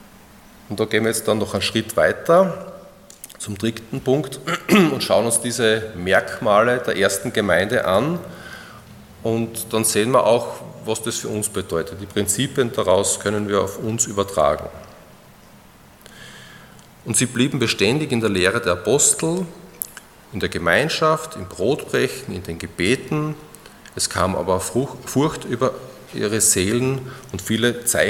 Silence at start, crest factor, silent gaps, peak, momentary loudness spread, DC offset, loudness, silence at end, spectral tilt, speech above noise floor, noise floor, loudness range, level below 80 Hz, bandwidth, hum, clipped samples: 0 s; 20 dB; none; 0 dBFS; 16 LU; under 0.1%; -20 LUFS; 0 s; -3.5 dB/octave; 27 dB; -47 dBFS; 5 LU; -54 dBFS; 17.5 kHz; none; under 0.1%